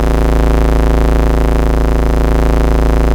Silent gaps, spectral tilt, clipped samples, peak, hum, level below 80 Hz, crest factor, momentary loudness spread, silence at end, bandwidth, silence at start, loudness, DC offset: none; -7.5 dB/octave; under 0.1%; 0 dBFS; none; -12 dBFS; 10 dB; 1 LU; 0 s; 16 kHz; 0 s; -13 LUFS; under 0.1%